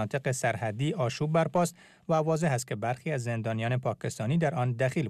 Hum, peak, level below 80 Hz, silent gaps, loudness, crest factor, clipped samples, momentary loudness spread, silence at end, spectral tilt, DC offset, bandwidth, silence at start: none; -16 dBFS; -66 dBFS; none; -29 LUFS; 14 dB; under 0.1%; 6 LU; 0 s; -6 dB/octave; under 0.1%; 14 kHz; 0 s